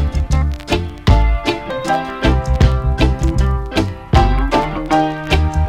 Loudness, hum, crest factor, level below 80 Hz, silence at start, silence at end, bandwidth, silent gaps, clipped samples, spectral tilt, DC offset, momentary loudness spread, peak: -17 LUFS; none; 14 dB; -18 dBFS; 0 s; 0 s; 11 kHz; none; under 0.1%; -6.5 dB/octave; under 0.1%; 5 LU; 0 dBFS